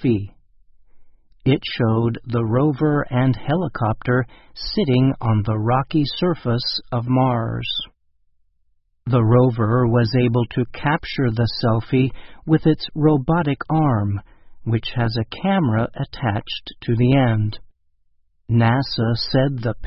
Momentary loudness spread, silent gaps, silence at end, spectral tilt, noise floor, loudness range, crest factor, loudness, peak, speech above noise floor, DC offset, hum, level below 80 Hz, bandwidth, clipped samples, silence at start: 8 LU; none; 0 s; -11 dB/octave; -62 dBFS; 2 LU; 18 dB; -20 LUFS; -2 dBFS; 43 dB; under 0.1%; none; -44 dBFS; 5.8 kHz; under 0.1%; 0 s